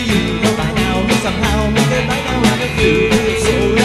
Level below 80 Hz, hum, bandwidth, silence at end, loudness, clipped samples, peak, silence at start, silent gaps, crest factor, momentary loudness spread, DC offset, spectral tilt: -26 dBFS; none; 13 kHz; 0 s; -14 LUFS; under 0.1%; 0 dBFS; 0 s; none; 14 dB; 3 LU; 0.1%; -5 dB/octave